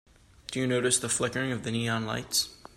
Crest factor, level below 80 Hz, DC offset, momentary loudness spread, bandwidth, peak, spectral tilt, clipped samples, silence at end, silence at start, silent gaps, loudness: 20 dB; -60 dBFS; under 0.1%; 7 LU; 16 kHz; -12 dBFS; -3 dB/octave; under 0.1%; 0.2 s; 0.5 s; none; -28 LUFS